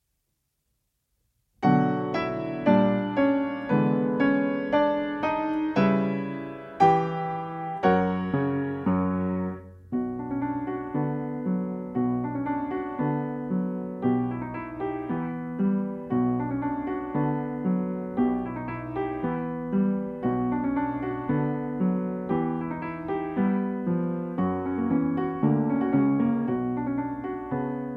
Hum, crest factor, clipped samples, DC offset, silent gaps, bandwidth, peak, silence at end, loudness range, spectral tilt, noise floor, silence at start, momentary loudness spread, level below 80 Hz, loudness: none; 20 dB; under 0.1%; under 0.1%; none; 6 kHz; -8 dBFS; 0 s; 5 LU; -9.5 dB/octave; -77 dBFS; 1.6 s; 8 LU; -56 dBFS; -27 LUFS